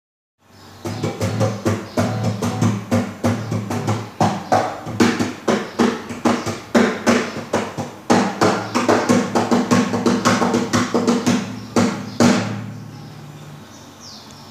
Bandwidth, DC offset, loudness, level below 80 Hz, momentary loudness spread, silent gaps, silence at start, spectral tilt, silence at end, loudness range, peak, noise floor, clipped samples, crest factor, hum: 15.5 kHz; under 0.1%; -19 LUFS; -56 dBFS; 19 LU; none; 0.6 s; -5.5 dB/octave; 0 s; 4 LU; 0 dBFS; -39 dBFS; under 0.1%; 20 dB; none